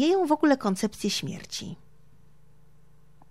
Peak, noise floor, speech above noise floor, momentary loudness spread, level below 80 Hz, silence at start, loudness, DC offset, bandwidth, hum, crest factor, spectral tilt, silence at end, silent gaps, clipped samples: -8 dBFS; -60 dBFS; 34 dB; 15 LU; -62 dBFS; 0 s; -26 LUFS; 0.3%; 15.5 kHz; none; 20 dB; -4.5 dB/octave; 1.55 s; none; under 0.1%